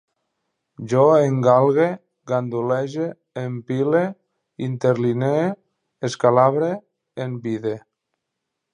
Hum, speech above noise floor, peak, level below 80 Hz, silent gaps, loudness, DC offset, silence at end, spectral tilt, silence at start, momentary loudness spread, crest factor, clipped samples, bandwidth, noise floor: none; 61 dB; -2 dBFS; -68 dBFS; none; -20 LUFS; under 0.1%; 0.95 s; -7.5 dB/octave; 0.8 s; 15 LU; 20 dB; under 0.1%; 10.5 kHz; -80 dBFS